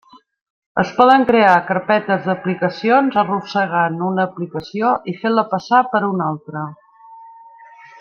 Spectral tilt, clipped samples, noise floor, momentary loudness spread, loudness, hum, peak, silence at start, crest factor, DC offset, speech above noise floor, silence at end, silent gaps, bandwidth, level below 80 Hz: -7 dB/octave; under 0.1%; -42 dBFS; 13 LU; -17 LUFS; none; -2 dBFS; 0.75 s; 16 dB; under 0.1%; 26 dB; 0.7 s; none; 7 kHz; -60 dBFS